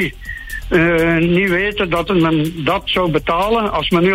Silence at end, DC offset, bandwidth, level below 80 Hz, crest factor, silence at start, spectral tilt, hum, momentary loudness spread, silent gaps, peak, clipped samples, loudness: 0 s; under 0.1%; 16 kHz; -34 dBFS; 14 dB; 0 s; -6.5 dB/octave; none; 6 LU; none; -2 dBFS; under 0.1%; -15 LUFS